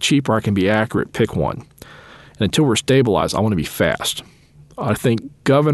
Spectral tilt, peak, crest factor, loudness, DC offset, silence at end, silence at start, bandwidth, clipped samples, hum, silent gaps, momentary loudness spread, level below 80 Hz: -5.5 dB/octave; -2 dBFS; 16 dB; -18 LUFS; under 0.1%; 0 s; 0 s; 12.5 kHz; under 0.1%; none; none; 8 LU; -44 dBFS